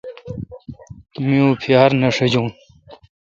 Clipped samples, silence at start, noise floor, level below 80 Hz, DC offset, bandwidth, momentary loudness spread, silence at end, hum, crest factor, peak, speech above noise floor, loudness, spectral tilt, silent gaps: under 0.1%; 0.05 s; -45 dBFS; -50 dBFS; under 0.1%; 7.6 kHz; 22 LU; 0.3 s; none; 18 dB; 0 dBFS; 30 dB; -16 LUFS; -6.5 dB/octave; none